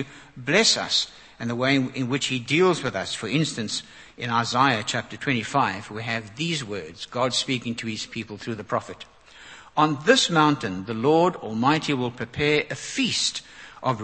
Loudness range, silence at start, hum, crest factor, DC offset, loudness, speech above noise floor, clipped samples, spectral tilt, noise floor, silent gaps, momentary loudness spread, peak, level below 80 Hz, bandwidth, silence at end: 6 LU; 0 s; none; 24 dB; under 0.1%; -24 LUFS; 22 dB; under 0.1%; -4 dB/octave; -46 dBFS; none; 14 LU; -2 dBFS; -60 dBFS; 8.8 kHz; 0 s